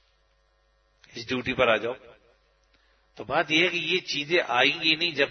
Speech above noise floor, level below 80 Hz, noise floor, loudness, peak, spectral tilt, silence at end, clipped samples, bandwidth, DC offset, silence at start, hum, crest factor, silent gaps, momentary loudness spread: 41 dB; -62 dBFS; -66 dBFS; -24 LUFS; -6 dBFS; -3.5 dB/octave; 0 s; under 0.1%; 6.6 kHz; under 0.1%; 1.15 s; none; 22 dB; none; 18 LU